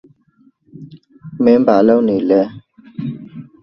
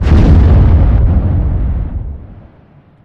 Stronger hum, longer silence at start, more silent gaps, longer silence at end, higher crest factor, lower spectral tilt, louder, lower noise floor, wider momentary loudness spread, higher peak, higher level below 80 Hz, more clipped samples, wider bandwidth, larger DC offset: neither; first, 0.8 s vs 0 s; neither; second, 0.2 s vs 0.7 s; first, 16 dB vs 8 dB; about the same, -9.5 dB/octave vs -10 dB/octave; second, -14 LUFS vs -11 LUFS; first, -54 dBFS vs -43 dBFS; first, 23 LU vs 17 LU; about the same, 0 dBFS vs 0 dBFS; second, -58 dBFS vs -12 dBFS; neither; about the same, 6 kHz vs 5.6 kHz; neither